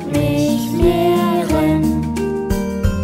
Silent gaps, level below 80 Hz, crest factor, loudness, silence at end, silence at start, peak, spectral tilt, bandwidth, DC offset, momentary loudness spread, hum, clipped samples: none; -28 dBFS; 14 dB; -17 LUFS; 0 s; 0 s; -2 dBFS; -6.5 dB/octave; 16.5 kHz; under 0.1%; 5 LU; none; under 0.1%